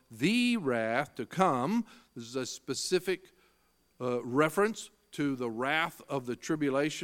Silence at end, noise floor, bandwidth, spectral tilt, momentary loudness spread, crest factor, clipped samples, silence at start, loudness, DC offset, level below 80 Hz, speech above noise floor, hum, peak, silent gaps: 0 s; -70 dBFS; 17 kHz; -4.5 dB/octave; 10 LU; 22 dB; under 0.1%; 0.1 s; -31 LUFS; under 0.1%; -72 dBFS; 39 dB; none; -10 dBFS; none